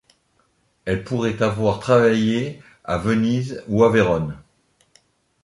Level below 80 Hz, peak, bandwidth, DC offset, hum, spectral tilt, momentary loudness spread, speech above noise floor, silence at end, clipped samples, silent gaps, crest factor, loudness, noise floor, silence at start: -46 dBFS; -4 dBFS; 11.5 kHz; under 0.1%; none; -7 dB/octave; 15 LU; 45 dB; 1.05 s; under 0.1%; none; 18 dB; -20 LUFS; -64 dBFS; 0.85 s